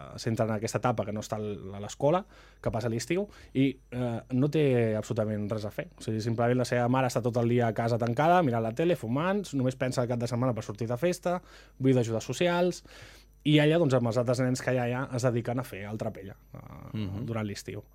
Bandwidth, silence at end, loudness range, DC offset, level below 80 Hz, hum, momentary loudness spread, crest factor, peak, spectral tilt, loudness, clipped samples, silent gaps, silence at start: 15.5 kHz; 0.15 s; 4 LU; under 0.1%; -56 dBFS; none; 11 LU; 20 dB; -10 dBFS; -6.5 dB/octave; -29 LUFS; under 0.1%; none; 0 s